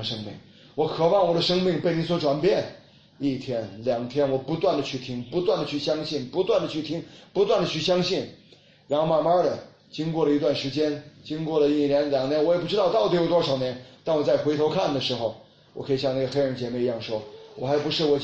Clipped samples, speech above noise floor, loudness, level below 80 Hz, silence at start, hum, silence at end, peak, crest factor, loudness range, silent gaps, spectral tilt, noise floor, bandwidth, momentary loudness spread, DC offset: under 0.1%; 30 dB; -25 LUFS; -58 dBFS; 0 s; none; 0 s; -10 dBFS; 16 dB; 3 LU; none; -6 dB/octave; -54 dBFS; 8.2 kHz; 11 LU; under 0.1%